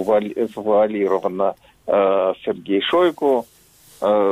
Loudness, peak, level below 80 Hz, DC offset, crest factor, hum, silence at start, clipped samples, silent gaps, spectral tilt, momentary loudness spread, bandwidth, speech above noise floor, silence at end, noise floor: -19 LUFS; -6 dBFS; -60 dBFS; under 0.1%; 14 dB; none; 0 s; under 0.1%; none; -6 dB/octave; 7 LU; 15 kHz; 31 dB; 0 s; -50 dBFS